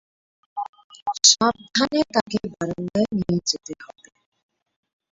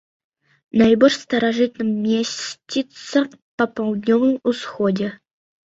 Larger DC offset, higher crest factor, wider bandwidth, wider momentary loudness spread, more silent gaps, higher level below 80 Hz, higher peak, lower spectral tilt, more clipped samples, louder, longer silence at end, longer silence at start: neither; about the same, 22 dB vs 18 dB; about the same, 8 kHz vs 8 kHz; first, 20 LU vs 10 LU; about the same, 0.69-0.73 s, 0.84-0.90 s, 1.02-1.06 s, 2.21-2.26 s vs 3.42-3.58 s; about the same, -56 dBFS vs -58 dBFS; about the same, -2 dBFS vs -2 dBFS; second, -2.5 dB/octave vs -5 dB/octave; neither; about the same, -21 LUFS vs -20 LUFS; first, 1.3 s vs 0.5 s; second, 0.55 s vs 0.75 s